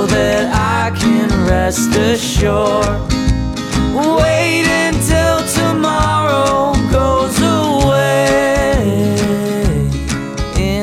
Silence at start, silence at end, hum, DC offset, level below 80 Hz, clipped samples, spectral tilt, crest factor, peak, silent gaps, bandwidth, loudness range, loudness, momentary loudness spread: 0 s; 0 s; none; under 0.1%; -24 dBFS; under 0.1%; -5 dB/octave; 14 dB; 0 dBFS; none; 17.5 kHz; 1 LU; -14 LUFS; 5 LU